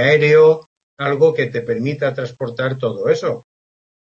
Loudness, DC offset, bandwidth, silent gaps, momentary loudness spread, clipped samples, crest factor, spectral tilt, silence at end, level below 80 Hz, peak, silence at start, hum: -17 LUFS; under 0.1%; 7.2 kHz; 0.66-0.97 s; 13 LU; under 0.1%; 14 dB; -6.5 dB/octave; 0.65 s; -62 dBFS; -2 dBFS; 0 s; none